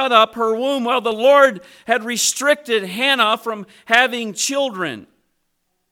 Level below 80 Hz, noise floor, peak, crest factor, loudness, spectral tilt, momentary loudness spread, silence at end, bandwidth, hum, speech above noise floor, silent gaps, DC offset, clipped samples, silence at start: -66 dBFS; -70 dBFS; 0 dBFS; 18 dB; -17 LUFS; -1.5 dB/octave; 12 LU; 0.9 s; 17 kHz; none; 52 dB; none; under 0.1%; under 0.1%; 0 s